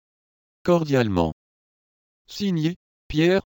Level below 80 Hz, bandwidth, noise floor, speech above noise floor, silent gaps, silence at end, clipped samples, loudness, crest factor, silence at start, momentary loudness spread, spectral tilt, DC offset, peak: -46 dBFS; 17 kHz; under -90 dBFS; over 69 dB; 1.32-2.25 s, 2.76-3.10 s; 0.05 s; under 0.1%; -23 LUFS; 18 dB; 0.65 s; 18 LU; -7 dB/octave; under 0.1%; -6 dBFS